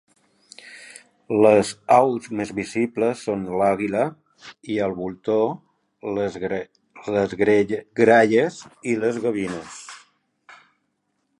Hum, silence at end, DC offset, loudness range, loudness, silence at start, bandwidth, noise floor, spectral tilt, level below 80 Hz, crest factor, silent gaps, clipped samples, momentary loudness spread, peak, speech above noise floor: none; 1.4 s; under 0.1%; 5 LU; -21 LUFS; 0.65 s; 11.5 kHz; -73 dBFS; -6 dB/octave; -60 dBFS; 20 dB; none; under 0.1%; 21 LU; -2 dBFS; 52 dB